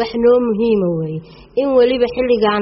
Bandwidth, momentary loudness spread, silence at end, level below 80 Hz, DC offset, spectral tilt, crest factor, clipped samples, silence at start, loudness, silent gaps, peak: 5.8 kHz; 10 LU; 0 s; -44 dBFS; under 0.1%; -5 dB/octave; 12 dB; under 0.1%; 0 s; -16 LUFS; none; -2 dBFS